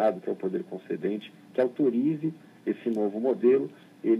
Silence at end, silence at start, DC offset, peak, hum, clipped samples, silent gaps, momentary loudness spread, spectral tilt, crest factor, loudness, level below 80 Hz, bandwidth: 0 s; 0 s; under 0.1%; -10 dBFS; none; under 0.1%; none; 11 LU; -9 dB/octave; 16 dB; -28 LUFS; -86 dBFS; 5.4 kHz